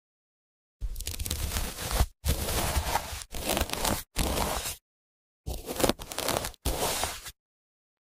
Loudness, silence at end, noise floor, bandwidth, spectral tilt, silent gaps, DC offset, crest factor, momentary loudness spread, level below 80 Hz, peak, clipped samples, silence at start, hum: -31 LUFS; 0.7 s; under -90 dBFS; 16 kHz; -3 dB/octave; 4.81-5.44 s; under 0.1%; 26 dB; 12 LU; -38 dBFS; -6 dBFS; under 0.1%; 0.8 s; none